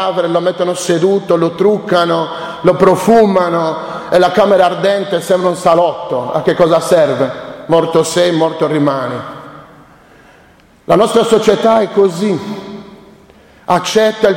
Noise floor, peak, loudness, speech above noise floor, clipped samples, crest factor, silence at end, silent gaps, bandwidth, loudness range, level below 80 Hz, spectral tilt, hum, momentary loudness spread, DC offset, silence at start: -45 dBFS; 0 dBFS; -12 LUFS; 34 dB; under 0.1%; 12 dB; 0 s; none; 16.5 kHz; 4 LU; -50 dBFS; -5.5 dB/octave; none; 10 LU; under 0.1%; 0 s